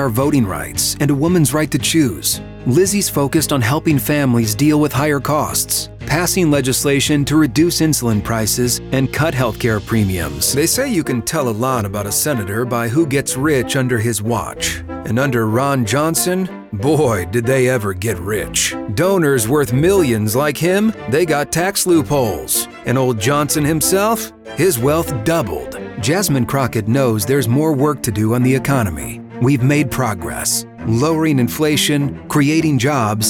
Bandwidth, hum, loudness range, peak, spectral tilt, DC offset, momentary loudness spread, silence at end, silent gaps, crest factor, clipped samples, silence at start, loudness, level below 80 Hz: over 20 kHz; none; 2 LU; -2 dBFS; -4.5 dB/octave; under 0.1%; 5 LU; 0 s; none; 14 dB; under 0.1%; 0 s; -16 LUFS; -40 dBFS